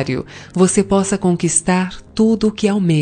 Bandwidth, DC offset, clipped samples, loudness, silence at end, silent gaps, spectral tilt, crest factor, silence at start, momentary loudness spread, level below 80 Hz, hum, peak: 10 kHz; under 0.1%; under 0.1%; -16 LUFS; 0 s; none; -5 dB/octave; 14 dB; 0 s; 8 LU; -42 dBFS; none; 0 dBFS